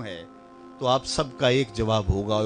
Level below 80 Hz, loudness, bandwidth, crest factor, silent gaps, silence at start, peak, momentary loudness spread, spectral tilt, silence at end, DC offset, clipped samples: -40 dBFS; -24 LUFS; 10 kHz; 18 dB; none; 0 s; -8 dBFS; 9 LU; -5 dB/octave; 0 s; under 0.1%; under 0.1%